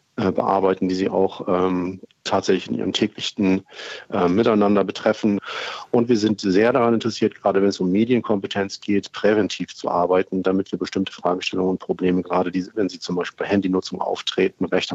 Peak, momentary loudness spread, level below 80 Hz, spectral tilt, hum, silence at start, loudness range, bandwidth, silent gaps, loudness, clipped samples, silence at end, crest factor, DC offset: -4 dBFS; 7 LU; -62 dBFS; -6 dB/octave; none; 0.2 s; 3 LU; 8 kHz; none; -21 LUFS; under 0.1%; 0 s; 16 dB; under 0.1%